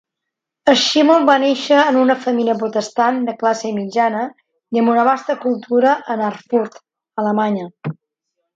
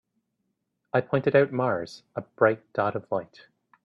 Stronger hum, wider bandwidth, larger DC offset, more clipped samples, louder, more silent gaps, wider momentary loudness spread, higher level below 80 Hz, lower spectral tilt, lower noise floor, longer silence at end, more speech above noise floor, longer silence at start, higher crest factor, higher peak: neither; first, 9 kHz vs 7.4 kHz; neither; neither; first, -16 LUFS vs -26 LUFS; neither; about the same, 11 LU vs 12 LU; about the same, -68 dBFS vs -68 dBFS; second, -4.5 dB/octave vs -8 dB/octave; about the same, -81 dBFS vs -78 dBFS; about the same, 0.6 s vs 0.6 s; first, 65 dB vs 53 dB; second, 0.65 s vs 0.95 s; second, 16 dB vs 22 dB; first, 0 dBFS vs -6 dBFS